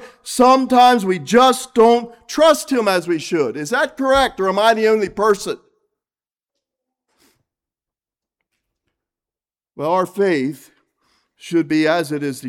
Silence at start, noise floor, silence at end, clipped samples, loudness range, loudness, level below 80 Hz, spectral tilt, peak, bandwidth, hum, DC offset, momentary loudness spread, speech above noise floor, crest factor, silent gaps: 0 s; under -90 dBFS; 0 s; under 0.1%; 11 LU; -16 LUFS; -52 dBFS; -4 dB/octave; -2 dBFS; 17 kHz; none; under 0.1%; 9 LU; over 74 dB; 16 dB; none